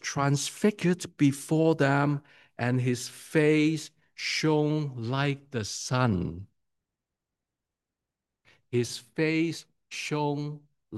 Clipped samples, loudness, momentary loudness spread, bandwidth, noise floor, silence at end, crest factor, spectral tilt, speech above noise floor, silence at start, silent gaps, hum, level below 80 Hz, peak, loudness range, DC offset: under 0.1%; -28 LUFS; 12 LU; 12.5 kHz; -88 dBFS; 0 s; 20 dB; -5.5 dB/octave; 61 dB; 0.05 s; none; none; -66 dBFS; -10 dBFS; 8 LU; under 0.1%